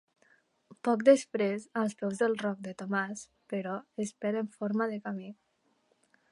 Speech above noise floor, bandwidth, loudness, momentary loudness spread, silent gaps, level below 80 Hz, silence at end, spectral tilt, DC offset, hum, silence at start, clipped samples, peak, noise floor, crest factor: 42 dB; 11.5 kHz; -31 LUFS; 14 LU; none; -82 dBFS; 1 s; -5.5 dB/octave; under 0.1%; none; 0.85 s; under 0.1%; -10 dBFS; -73 dBFS; 22 dB